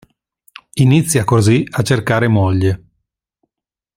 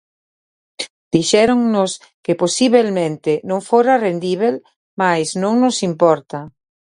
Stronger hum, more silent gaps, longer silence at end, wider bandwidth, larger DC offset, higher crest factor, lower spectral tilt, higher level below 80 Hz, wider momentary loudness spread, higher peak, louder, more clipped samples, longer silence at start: neither; second, none vs 0.90-1.11 s, 2.14-2.23 s, 4.76-4.97 s; first, 1.2 s vs 0.45 s; first, 16 kHz vs 11.5 kHz; neither; about the same, 14 dB vs 16 dB; first, -6 dB/octave vs -4.5 dB/octave; first, -48 dBFS vs -58 dBFS; second, 6 LU vs 15 LU; about the same, -2 dBFS vs 0 dBFS; about the same, -14 LUFS vs -16 LUFS; neither; about the same, 0.75 s vs 0.8 s